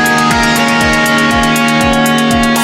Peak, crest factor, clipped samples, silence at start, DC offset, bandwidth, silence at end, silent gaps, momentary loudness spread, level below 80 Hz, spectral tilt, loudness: 0 dBFS; 10 dB; under 0.1%; 0 s; under 0.1%; 17 kHz; 0 s; none; 1 LU; -28 dBFS; -3.5 dB/octave; -9 LUFS